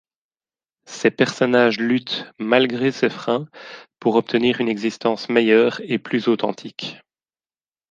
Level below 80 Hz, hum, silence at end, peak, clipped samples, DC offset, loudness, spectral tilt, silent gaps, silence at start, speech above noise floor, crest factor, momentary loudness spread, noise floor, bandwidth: -66 dBFS; none; 0.95 s; -2 dBFS; under 0.1%; under 0.1%; -20 LUFS; -5.5 dB/octave; none; 0.9 s; over 70 dB; 20 dB; 14 LU; under -90 dBFS; 9.2 kHz